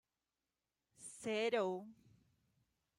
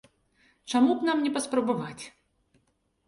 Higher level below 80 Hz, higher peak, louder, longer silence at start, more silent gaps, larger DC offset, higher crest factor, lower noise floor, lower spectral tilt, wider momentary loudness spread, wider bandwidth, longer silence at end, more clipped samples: second, -86 dBFS vs -70 dBFS; second, -26 dBFS vs -12 dBFS; second, -40 LUFS vs -26 LUFS; first, 1 s vs 0.65 s; neither; neither; about the same, 20 dB vs 18 dB; first, under -90 dBFS vs -72 dBFS; about the same, -4 dB/octave vs -4.5 dB/octave; about the same, 19 LU vs 21 LU; first, 13.5 kHz vs 11.5 kHz; about the same, 1.05 s vs 1 s; neither